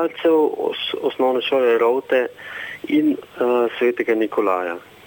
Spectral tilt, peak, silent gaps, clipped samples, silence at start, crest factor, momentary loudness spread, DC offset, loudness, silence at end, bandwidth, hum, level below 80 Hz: -5.5 dB/octave; -6 dBFS; none; under 0.1%; 0 s; 14 dB; 8 LU; under 0.1%; -20 LUFS; 0.25 s; 17.5 kHz; none; -68 dBFS